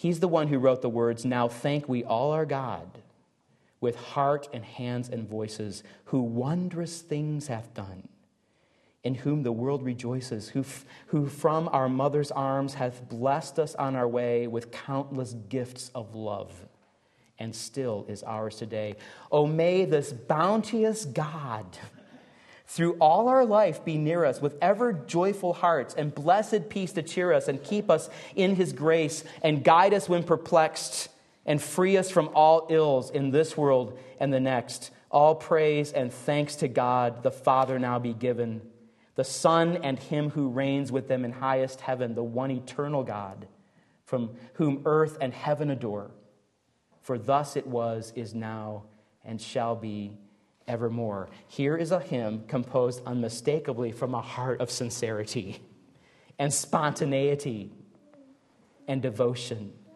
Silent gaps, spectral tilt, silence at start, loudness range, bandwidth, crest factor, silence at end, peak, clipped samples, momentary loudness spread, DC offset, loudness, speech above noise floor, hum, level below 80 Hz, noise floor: none; -6 dB/octave; 0 s; 9 LU; 12.5 kHz; 22 dB; 0.25 s; -6 dBFS; under 0.1%; 14 LU; under 0.1%; -27 LUFS; 44 dB; none; -72 dBFS; -71 dBFS